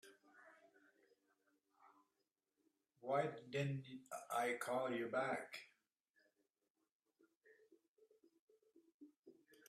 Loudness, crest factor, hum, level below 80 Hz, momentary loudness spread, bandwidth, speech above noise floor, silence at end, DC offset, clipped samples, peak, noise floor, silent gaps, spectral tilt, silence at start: -44 LUFS; 22 dB; none; under -90 dBFS; 12 LU; 14 kHz; 46 dB; 0.35 s; under 0.1%; under 0.1%; -28 dBFS; -90 dBFS; 6.10-6.14 s, 6.70-6.75 s, 6.92-7.00 s, 7.37-7.41 s, 7.88-7.95 s, 8.40-8.48 s, 8.94-9.00 s, 9.19-9.23 s; -5.5 dB/octave; 0.05 s